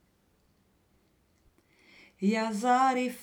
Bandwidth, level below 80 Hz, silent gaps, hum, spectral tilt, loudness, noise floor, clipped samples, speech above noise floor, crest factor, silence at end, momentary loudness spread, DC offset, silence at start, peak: over 20 kHz; -74 dBFS; none; none; -5 dB/octave; -27 LUFS; -69 dBFS; under 0.1%; 42 dB; 18 dB; 0 s; 5 LU; under 0.1%; 2.2 s; -14 dBFS